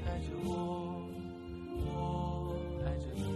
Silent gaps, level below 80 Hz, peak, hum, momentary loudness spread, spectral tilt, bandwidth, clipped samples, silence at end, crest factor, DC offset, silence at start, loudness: none; -46 dBFS; -24 dBFS; none; 8 LU; -7.5 dB/octave; 13.5 kHz; under 0.1%; 0 s; 14 dB; under 0.1%; 0 s; -39 LUFS